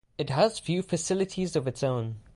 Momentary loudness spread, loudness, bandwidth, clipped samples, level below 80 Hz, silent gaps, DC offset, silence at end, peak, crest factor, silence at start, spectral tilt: 6 LU; -28 LUFS; 11.5 kHz; under 0.1%; -58 dBFS; none; under 0.1%; 0.15 s; -10 dBFS; 18 dB; 0.2 s; -5.5 dB/octave